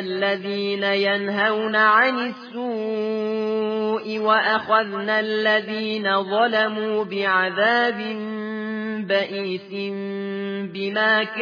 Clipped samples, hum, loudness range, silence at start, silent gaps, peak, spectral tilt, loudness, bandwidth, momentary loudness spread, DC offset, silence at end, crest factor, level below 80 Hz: under 0.1%; none; 4 LU; 0 s; none; -6 dBFS; -6 dB/octave; -22 LUFS; 5.2 kHz; 10 LU; under 0.1%; 0 s; 16 dB; -80 dBFS